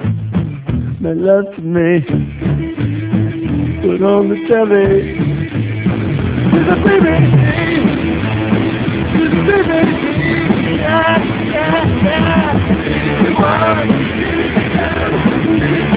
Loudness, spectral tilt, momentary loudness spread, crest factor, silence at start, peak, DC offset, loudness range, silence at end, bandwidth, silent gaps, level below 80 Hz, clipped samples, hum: -14 LUFS; -11 dB/octave; 7 LU; 12 dB; 0 s; 0 dBFS; under 0.1%; 3 LU; 0 s; 4 kHz; none; -30 dBFS; under 0.1%; none